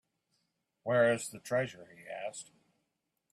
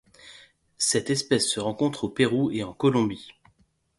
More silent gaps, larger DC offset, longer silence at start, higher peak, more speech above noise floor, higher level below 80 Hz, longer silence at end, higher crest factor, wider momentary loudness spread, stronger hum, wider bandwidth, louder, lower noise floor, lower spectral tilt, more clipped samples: neither; neither; first, 0.85 s vs 0.25 s; second, -16 dBFS vs -8 dBFS; first, 52 dB vs 40 dB; second, -78 dBFS vs -60 dBFS; first, 0.9 s vs 0.65 s; about the same, 20 dB vs 18 dB; first, 18 LU vs 5 LU; neither; first, 14 kHz vs 11.5 kHz; second, -33 LUFS vs -25 LUFS; first, -83 dBFS vs -65 dBFS; about the same, -4.5 dB/octave vs -4 dB/octave; neither